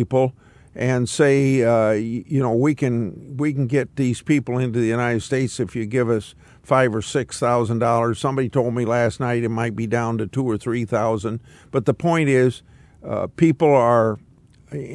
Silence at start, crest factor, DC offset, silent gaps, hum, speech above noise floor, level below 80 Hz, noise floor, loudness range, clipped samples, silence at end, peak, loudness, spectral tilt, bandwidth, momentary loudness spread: 0 s; 18 dB; under 0.1%; none; none; 24 dB; -54 dBFS; -43 dBFS; 2 LU; under 0.1%; 0 s; -4 dBFS; -20 LUFS; -7 dB/octave; 12 kHz; 9 LU